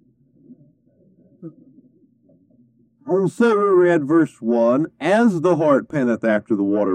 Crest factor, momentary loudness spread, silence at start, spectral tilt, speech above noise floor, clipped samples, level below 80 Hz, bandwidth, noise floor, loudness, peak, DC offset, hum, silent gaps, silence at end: 16 dB; 6 LU; 0.5 s; -7.5 dB/octave; 39 dB; under 0.1%; -70 dBFS; 10 kHz; -57 dBFS; -18 LUFS; -4 dBFS; under 0.1%; none; none; 0 s